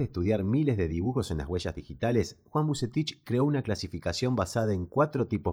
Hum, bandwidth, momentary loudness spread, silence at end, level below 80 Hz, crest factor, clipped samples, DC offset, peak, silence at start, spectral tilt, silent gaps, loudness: none; 16 kHz; 6 LU; 0 s; -48 dBFS; 16 dB; under 0.1%; under 0.1%; -12 dBFS; 0 s; -6.5 dB/octave; none; -29 LUFS